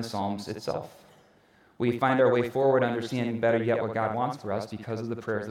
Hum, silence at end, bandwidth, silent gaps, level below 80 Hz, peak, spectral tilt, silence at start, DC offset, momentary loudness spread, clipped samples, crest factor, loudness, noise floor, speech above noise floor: none; 0 s; 15.5 kHz; none; -70 dBFS; -10 dBFS; -6.5 dB/octave; 0 s; under 0.1%; 11 LU; under 0.1%; 16 dB; -28 LUFS; -61 dBFS; 33 dB